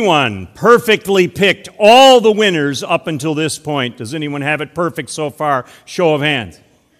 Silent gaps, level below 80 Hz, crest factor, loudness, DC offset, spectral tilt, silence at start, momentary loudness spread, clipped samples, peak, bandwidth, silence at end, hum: none; -54 dBFS; 14 dB; -13 LUFS; under 0.1%; -4 dB/octave; 0 s; 13 LU; 0.8%; 0 dBFS; 18 kHz; 0.5 s; none